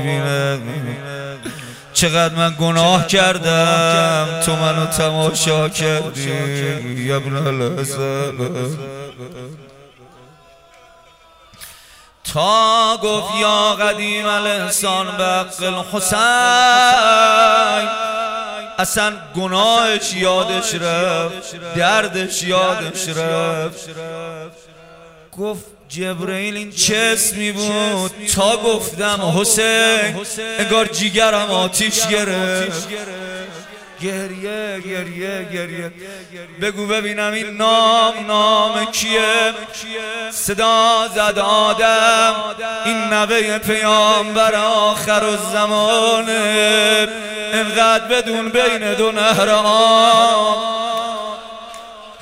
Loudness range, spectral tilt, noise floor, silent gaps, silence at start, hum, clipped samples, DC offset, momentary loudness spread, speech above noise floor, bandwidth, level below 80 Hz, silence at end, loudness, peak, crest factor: 10 LU; -3 dB/octave; -47 dBFS; none; 0 s; none; under 0.1%; under 0.1%; 15 LU; 31 dB; 16 kHz; -50 dBFS; 0 s; -15 LUFS; 0 dBFS; 16 dB